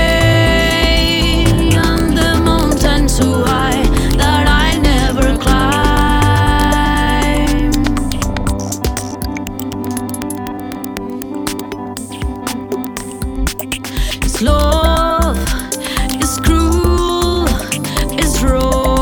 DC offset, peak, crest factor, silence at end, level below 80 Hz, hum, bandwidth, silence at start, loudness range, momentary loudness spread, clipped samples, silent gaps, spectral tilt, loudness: under 0.1%; 0 dBFS; 12 dB; 0 s; -18 dBFS; none; over 20 kHz; 0 s; 10 LU; 11 LU; under 0.1%; none; -4.5 dB/octave; -15 LUFS